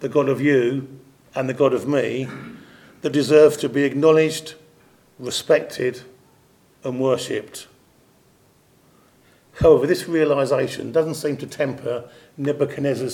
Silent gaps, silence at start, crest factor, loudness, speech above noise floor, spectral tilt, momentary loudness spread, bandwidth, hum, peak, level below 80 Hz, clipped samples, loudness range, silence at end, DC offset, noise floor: none; 0 s; 20 dB; -20 LUFS; 37 dB; -5.5 dB/octave; 16 LU; 17 kHz; none; -2 dBFS; -52 dBFS; under 0.1%; 9 LU; 0 s; under 0.1%; -57 dBFS